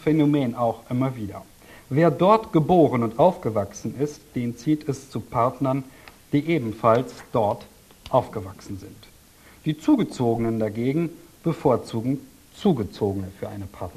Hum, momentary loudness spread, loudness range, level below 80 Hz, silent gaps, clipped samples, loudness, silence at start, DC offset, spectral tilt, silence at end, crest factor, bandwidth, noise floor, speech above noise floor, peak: none; 15 LU; 5 LU; -52 dBFS; none; under 0.1%; -23 LUFS; 0 s; under 0.1%; -7.5 dB/octave; 0.05 s; 20 dB; 14 kHz; -51 dBFS; 28 dB; -4 dBFS